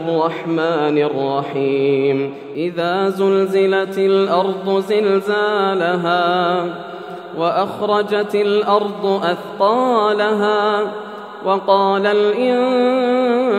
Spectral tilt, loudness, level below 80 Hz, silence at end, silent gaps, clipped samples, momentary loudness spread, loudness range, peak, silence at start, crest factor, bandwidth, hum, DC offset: -6.5 dB/octave; -17 LUFS; -72 dBFS; 0 s; none; under 0.1%; 6 LU; 2 LU; -2 dBFS; 0 s; 16 dB; 12.5 kHz; none; under 0.1%